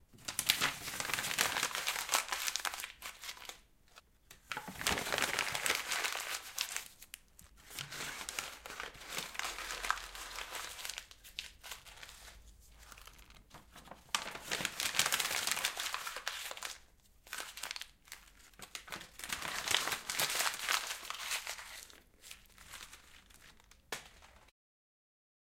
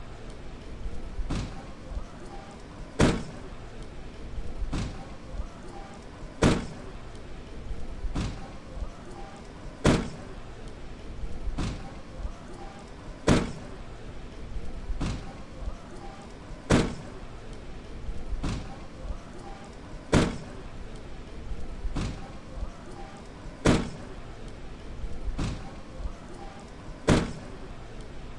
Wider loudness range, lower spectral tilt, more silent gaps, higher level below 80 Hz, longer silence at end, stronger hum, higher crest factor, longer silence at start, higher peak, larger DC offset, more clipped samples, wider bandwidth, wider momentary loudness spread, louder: first, 11 LU vs 5 LU; second, 0 dB/octave vs -5.5 dB/octave; neither; second, -64 dBFS vs -38 dBFS; first, 1 s vs 0 s; neither; first, 36 dB vs 24 dB; about the same, 0 s vs 0 s; about the same, -6 dBFS vs -8 dBFS; neither; neither; first, 17 kHz vs 11.5 kHz; about the same, 21 LU vs 19 LU; second, -37 LUFS vs -33 LUFS